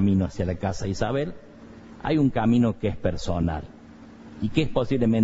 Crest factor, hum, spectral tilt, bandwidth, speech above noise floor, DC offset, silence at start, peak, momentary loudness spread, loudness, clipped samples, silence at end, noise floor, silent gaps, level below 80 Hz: 16 dB; none; -7.5 dB/octave; 8 kHz; 22 dB; under 0.1%; 0 s; -8 dBFS; 23 LU; -25 LUFS; under 0.1%; 0 s; -46 dBFS; none; -40 dBFS